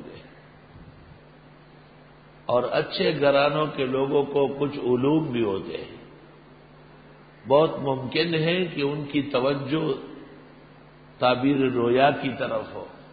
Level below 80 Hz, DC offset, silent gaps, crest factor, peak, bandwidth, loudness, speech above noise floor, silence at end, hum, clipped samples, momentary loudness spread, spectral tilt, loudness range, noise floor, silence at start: -58 dBFS; under 0.1%; none; 20 dB; -6 dBFS; 5 kHz; -24 LUFS; 27 dB; 0.05 s; none; under 0.1%; 16 LU; -10.5 dB/octave; 4 LU; -50 dBFS; 0 s